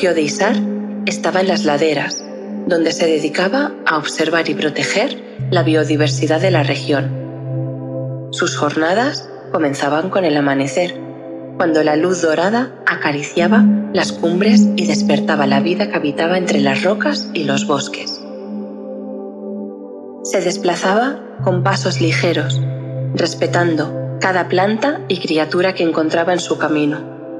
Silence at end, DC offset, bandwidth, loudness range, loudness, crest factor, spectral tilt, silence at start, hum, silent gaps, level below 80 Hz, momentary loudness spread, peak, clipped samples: 0 s; under 0.1%; 11.5 kHz; 5 LU; -16 LUFS; 16 dB; -5 dB/octave; 0 s; none; none; -62 dBFS; 11 LU; 0 dBFS; under 0.1%